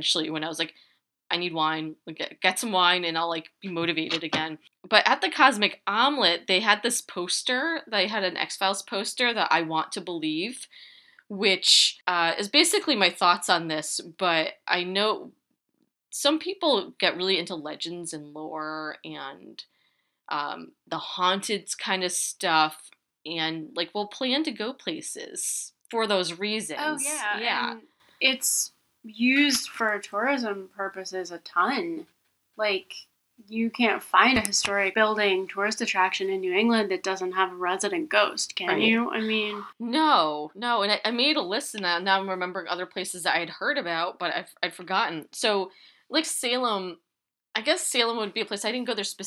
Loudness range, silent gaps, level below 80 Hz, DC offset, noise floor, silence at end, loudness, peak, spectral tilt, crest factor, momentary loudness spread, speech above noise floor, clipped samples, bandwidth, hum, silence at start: 6 LU; none; -68 dBFS; under 0.1%; -86 dBFS; 0 s; -25 LUFS; 0 dBFS; -2 dB/octave; 26 dB; 13 LU; 60 dB; under 0.1%; 15.5 kHz; none; 0 s